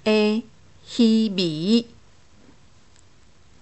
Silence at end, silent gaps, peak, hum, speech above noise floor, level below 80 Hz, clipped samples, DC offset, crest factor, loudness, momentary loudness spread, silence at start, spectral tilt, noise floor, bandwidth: 1.8 s; none; -6 dBFS; none; 36 dB; -62 dBFS; under 0.1%; 0.3%; 16 dB; -21 LUFS; 12 LU; 0.05 s; -6 dB/octave; -56 dBFS; 8.4 kHz